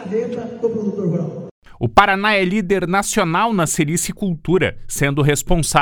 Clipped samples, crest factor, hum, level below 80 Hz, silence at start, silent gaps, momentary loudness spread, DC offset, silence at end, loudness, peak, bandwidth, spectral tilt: under 0.1%; 18 dB; none; -34 dBFS; 0 s; 1.51-1.62 s; 10 LU; under 0.1%; 0 s; -18 LUFS; 0 dBFS; 19.5 kHz; -4.5 dB/octave